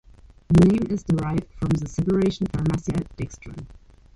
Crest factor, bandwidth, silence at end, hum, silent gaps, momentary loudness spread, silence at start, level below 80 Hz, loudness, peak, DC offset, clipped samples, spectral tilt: 18 dB; 11 kHz; 0.4 s; none; none; 17 LU; 0.5 s; -40 dBFS; -23 LUFS; -6 dBFS; under 0.1%; under 0.1%; -8 dB/octave